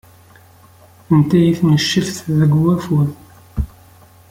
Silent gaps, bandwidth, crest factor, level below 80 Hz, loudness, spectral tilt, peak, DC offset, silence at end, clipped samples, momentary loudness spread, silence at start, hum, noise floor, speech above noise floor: none; 15.5 kHz; 14 dB; -36 dBFS; -16 LUFS; -6.5 dB/octave; -2 dBFS; under 0.1%; 0.65 s; under 0.1%; 13 LU; 1.1 s; none; -46 dBFS; 32 dB